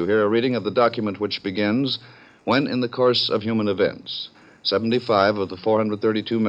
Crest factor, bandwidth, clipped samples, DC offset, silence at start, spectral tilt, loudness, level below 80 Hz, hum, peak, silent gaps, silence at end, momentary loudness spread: 18 dB; 8 kHz; under 0.1%; under 0.1%; 0 s; -7 dB/octave; -22 LUFS; -66 dBFS; none; -4 dBFS; none; 0 s; 8 LU